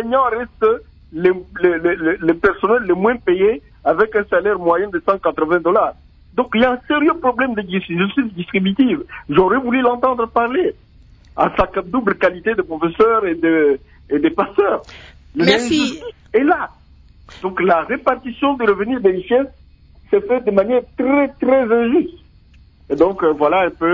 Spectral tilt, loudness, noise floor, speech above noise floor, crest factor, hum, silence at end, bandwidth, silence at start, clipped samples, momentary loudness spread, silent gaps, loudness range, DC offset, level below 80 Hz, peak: -6 dB/octave; -17 LUFS; -47 dBFS; 31 dB; 16 dB; none; 0 s; 8 kHz; 0 s; under 0.1%; 7 LU; none; 2 LU; under 0.1%; -44 dBFS; 0 dBFS